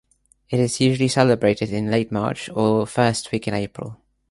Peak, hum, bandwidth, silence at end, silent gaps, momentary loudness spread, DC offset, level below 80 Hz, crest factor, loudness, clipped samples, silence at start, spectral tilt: -2 dBFS; none; 11.5 kHz; 0.35 s; none; 9 LU; under 0.1%; -52 dBFS; 20 dB; -21 LUFS; under 0.1%; 0.5 s; -5.5 dB/octave